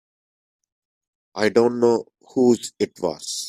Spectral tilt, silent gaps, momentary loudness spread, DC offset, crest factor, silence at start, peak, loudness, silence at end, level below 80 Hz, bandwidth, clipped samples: -4.5 dB/octave; none; 9 LU; under 0.1%; 20 dB; 1.35 s; -4 dBFS; -21 LUFS; 0 s; -66 dBFS; 14 kHz; under 0.1%